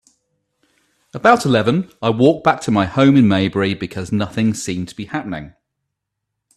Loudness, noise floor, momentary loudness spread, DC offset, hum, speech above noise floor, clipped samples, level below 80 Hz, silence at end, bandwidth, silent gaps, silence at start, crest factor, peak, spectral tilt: -16 LUFS; -78 dBFS; 13 LU; under 0.1%; none; 62 dB; under 0.1%; -52 dBFS; 1.1 s; 13 kHz; none; 1.15 s; 18 dB; 0 dBFS; -6 dB/octave